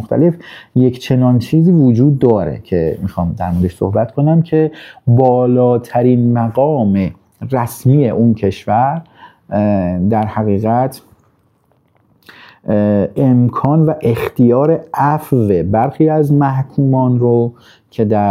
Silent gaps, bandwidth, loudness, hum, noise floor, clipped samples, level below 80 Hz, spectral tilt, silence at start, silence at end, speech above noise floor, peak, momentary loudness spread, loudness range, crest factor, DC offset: none; 15 kHz; -13 LUFS; none; -56 dBFS; under 0.1%; -46 dBFS; -9.5 dB/octave; 0 s; 0 s; 44 dB; 0 dBFS; 8 LU; 4 LU; 14 dB; under 0.1%